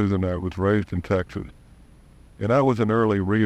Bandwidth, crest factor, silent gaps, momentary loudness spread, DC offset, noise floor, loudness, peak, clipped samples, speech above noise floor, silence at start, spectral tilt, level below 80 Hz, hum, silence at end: 11 kHz; 16 dB; none; 12 LU; under 0.1%; -50 dBFS; -23 LUFS; -8 dBFS; under 0.1%; 28 dB; 0 s; -8.5 dB/octave; -48 dBFS; none; 0 s